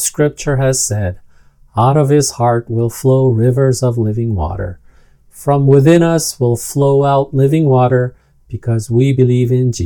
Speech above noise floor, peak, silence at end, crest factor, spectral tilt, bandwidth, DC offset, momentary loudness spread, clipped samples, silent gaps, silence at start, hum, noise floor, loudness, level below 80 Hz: 32 dB; 0 dBFS; 0 s; 12 dB; -6.5 dB/octave; 18.5 kHz; under 0.1%; 10 LU; 0.1%; none; 0 s; none; -45 dBFS; -13 LUFS; -38 dBFS